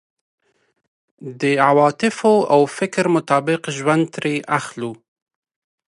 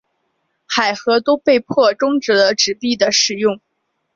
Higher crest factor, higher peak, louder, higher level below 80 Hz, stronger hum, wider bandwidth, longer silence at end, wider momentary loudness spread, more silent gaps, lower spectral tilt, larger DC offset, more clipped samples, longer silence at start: about the same, 18 dB vs 14 dB; about the same, 0 dBFS vs -2 dBFS; second, -18 LUFS vs -15 LUFS; second, -70 dBFS vs -60 dBFS; neither; first, 11.5 kHz vs 7.6 kHz; first, 0.95 s vs 0.6 s; first, 14 LU vs 6 LU; neither; first, -5.5 dB/octave vs -2.5 dB/octave; neither; neither; first, 1.2 s vs 0.7 s